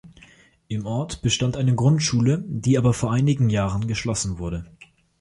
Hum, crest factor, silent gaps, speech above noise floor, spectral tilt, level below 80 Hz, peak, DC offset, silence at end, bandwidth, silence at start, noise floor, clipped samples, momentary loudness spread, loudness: none; 16 dB; none; 31 dB; -5.5 dB/octave; -44 dBFS; -6 dBFS; under 0.1%; 0.35 s; 11.5 kHz; 0.05 s; -53 dBFS; under 0.1%; 11 LU; -22 LUFS